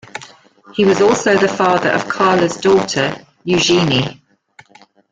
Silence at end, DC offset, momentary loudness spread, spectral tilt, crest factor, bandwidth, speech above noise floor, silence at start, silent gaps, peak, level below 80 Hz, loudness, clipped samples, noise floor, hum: 1 s; under 0.1%; 13 LU; -4.5 dB/octave; 14 dB; 9.4 kHz; 34 dB; 0.15 s; none; -2 dBFS; -52 dBFS; -14 LUFS; under 0.1%; -48 dBFS; none